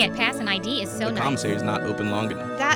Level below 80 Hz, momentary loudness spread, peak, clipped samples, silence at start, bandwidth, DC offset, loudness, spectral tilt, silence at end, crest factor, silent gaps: -58 dBFS; 4 LU; -6 dBFS; under 0.1%; 0 s; 19.5 kHz; under 0.1%; -25 LUFS; -4 dB/octave; 0 s; 18 dB; none